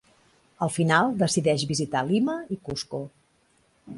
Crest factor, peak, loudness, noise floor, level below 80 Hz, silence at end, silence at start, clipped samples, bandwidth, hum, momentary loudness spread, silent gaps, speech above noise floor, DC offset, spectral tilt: 20 dB; -6 dBFS; -25 LUFS; -65 dBFS; -60 dBFS; 0 s; 0.6 s; under 0.1%; 11.5 kHz; none; 12 LU; none; 40 dB; under 0.1%; -5 dB/octave